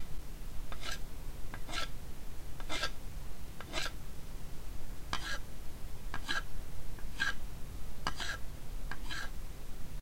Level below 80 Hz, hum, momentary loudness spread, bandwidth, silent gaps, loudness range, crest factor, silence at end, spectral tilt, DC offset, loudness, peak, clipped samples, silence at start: -42 dBFS; none; 12 LU; 16 kHz; none; 2 LU; 18 dB; 0 s; -3 dB/octave; under 0.1%; -43 LUFS; -16 dBFS; under 0.1%; 0 s